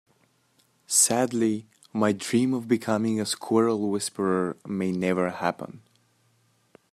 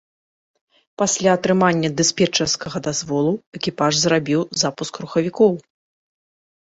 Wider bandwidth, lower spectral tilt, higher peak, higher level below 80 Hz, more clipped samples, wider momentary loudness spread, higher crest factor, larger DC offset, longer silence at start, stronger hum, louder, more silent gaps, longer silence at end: first, 15 kHz vs 8 kHz; about the same, -4 dB/octave vs -4 dB/octave; second, -6 dBFS vs -2 dBFS; second, -72 dBFS vs -58 dBFS; neither; about the same, 9 LU vs 7 LU; about the same, 20 dB vs 18 dB; neither; about the same, 0.9 s vs 1 s; neither; second, -25 LUFS vs -19 LUFS; second, none vs 3.47-3.52 s; about the same, 1.15 s vs 1.1 s